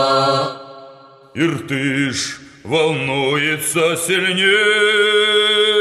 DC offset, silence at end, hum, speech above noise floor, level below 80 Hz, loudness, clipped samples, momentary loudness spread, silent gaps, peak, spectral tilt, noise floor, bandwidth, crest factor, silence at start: under 0.1%; 0 s; none; 26 dB; -60 dBFS; -15 LUFS; under 0.1%; 10 LU; none; -2 dBFS; -3 dB/octave; -42 dBFS; 13 kHz; 14 dB; 0 s